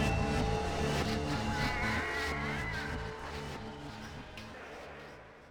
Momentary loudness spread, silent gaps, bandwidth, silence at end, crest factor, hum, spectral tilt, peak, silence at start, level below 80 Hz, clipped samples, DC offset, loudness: 14 LU; none; over 20 kHz; 0 s; 16 dB; none; -5 dB/octave; -20 dBFS; 0 s; -44 dBFS; under 0.1%; under 0.1%; -35 LUFS